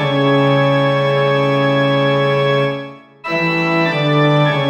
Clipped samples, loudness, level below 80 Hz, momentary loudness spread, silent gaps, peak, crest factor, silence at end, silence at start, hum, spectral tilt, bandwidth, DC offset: under 0.1%; -14 LUFS; -58 dBFS; 7 LU; none; -2 dBFS; 12 dB; 0 s; 0 s; none; -7.5 dB/octave; 8.2 kHz; under 0.1%